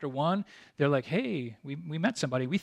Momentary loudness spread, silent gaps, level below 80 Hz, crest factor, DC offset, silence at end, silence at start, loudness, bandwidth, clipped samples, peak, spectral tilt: 11 LU; none; -74 dBFS; 18 dB; under 0.1%; 0 s; 0 s; -31 LUFS; 11 kHz; under 0.1%; -14 dBFS; -6 dB/octave